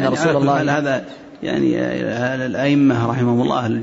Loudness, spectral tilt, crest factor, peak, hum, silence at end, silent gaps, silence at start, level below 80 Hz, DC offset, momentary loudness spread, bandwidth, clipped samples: -18 LUFS; -6.5 dB/octave; 12 dB; -6 dBFS; none; 0 s; none; 0 s; -52 dBFS; under 0.1%; 8 LU; 8 kHz; under 0.1%